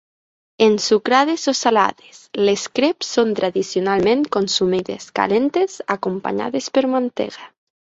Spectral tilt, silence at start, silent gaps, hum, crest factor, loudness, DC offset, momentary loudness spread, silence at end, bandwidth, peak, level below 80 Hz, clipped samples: -4 dB/octave; 0.6 s; none; none; 18 dB; -19 LUFS; under 0.1%; 7 LU; 0.45 s; 8 kHz; -2 dBFS; -58 dBFS; under 0.1%